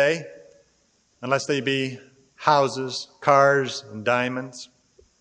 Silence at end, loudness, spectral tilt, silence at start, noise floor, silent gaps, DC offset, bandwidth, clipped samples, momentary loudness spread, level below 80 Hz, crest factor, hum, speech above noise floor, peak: 0.55 s; -23 LUFS; -4.5 dB/octave; 0 s; -65 dBFS; none; under 0.1%; 9.6 kHz; under 0.1%; 20 LU; -70 dBFS; 22 dB; none; 42 dB; -2 dBFS